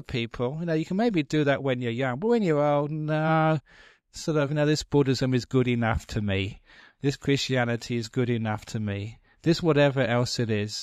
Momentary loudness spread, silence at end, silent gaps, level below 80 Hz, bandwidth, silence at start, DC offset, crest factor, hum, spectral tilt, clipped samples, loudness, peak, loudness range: 8 LU; 0 s; none; -50 dBFS; 13.5 kHz; 0.1 s; under 0.1%; 16 dB; none; -6 dB/octave; under 0.1%; -26 LUFS; -10 dBFS; 3 LU